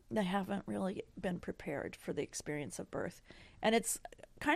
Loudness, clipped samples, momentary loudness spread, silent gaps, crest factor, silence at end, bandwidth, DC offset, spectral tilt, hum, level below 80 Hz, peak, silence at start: -39 LUFS; under 0.1%; 10 LU; none; 20 dB; 0 s; 15.5 kHz; under 0.1%; -4 dB/octave; none; -64 dBFS; -18 dBFS; 0.1 s